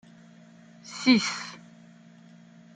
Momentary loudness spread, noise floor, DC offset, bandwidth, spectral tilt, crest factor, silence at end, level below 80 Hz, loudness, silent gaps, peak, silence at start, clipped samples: 26 LU; -52 dBFS; under 0.1%; 9.4 kHz; -3.5 dB/octave; 24 dB; 1.15 s; -76 dBFS; -25 LUFS; none; -8 dBFS; 0.85 s; under 0.1%